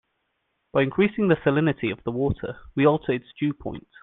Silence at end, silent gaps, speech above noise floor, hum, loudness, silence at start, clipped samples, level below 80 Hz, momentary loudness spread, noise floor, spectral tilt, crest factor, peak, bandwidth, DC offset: 0.25 s; none; 51 dB; none; -24 LUFS; 0.75 s; under 0.1%; -50 dBFS; 10 LU; -75 dBFS; -10.5 dB/octave; 18 dB; -6 dBFS; 4.1 kHz; under 0.1%